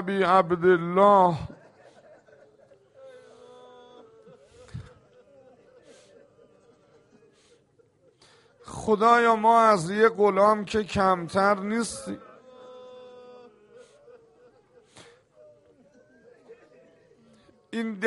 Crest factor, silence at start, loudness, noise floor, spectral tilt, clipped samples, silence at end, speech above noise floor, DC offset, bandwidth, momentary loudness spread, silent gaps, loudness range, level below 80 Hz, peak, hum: 22 dB; 0 s; -22 LUFS; -63 dBFS; -5.5 dB/octave; under 0.1%; 0 s; 41 dB; under 0.1%; 11.5 kHz; 25 LU; none; 19 LU; -60 dBFS; -6 dBFS; none